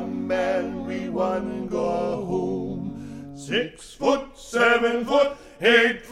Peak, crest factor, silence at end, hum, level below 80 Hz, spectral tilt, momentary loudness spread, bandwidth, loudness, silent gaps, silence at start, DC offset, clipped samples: -4 dBFS; 20 dB; 0 s; none; -50 dBFS; -4.5 dB/octave; 13 LU; 13 kHz; -23 LUFS; none; 0 s; under 0.1%; under 0.1%